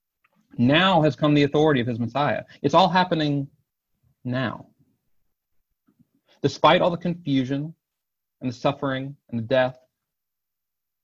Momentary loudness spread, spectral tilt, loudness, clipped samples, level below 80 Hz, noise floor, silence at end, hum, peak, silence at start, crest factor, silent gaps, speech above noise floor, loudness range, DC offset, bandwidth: 15 LU; -6.5 dB/octave; -22 LUFS; under 0.1%; -58 dBFS; -85 dBFS; 1.3 s; none; -4 dBFS; 0.6 s; 20 dB; none; 64 dB; 8 LU; under 0.1%; 7.6 kHz